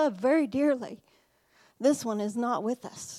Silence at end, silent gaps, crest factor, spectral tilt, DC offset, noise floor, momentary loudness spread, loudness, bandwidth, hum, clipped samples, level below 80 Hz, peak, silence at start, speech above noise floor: 0 s; none; 16 dB; -5 dB/octave; under 0.1%; -64 dBFS; 9 LU; -28 LUFS; 14.5 kHz; none; under 0.1%; -74 dBFS; -12 dBFS; 0 s; 36 dB